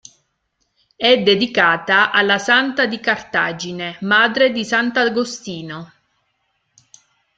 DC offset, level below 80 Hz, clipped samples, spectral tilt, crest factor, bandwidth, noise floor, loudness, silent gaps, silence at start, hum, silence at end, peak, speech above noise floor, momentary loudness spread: under 0.1%; -62 dBFS; under 0.1%; -3.5 dB/octave; 18 dB; 9 kHz; -70 dBFS; -16 LUFS; none; 1 s; none; 1.5 s; 0 dBFS; 53 dB; 12 LU